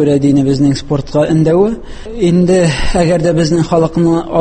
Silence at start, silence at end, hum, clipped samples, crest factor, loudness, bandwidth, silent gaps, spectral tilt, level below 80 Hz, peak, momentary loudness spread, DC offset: 0 s; 0 s; none; under 0.1%; 10 dB; -12 LUFS; 8.8 kHz; none; -7 dB/octave; -26 dBFS; 0 dBFS; 6 LU; under 0.1%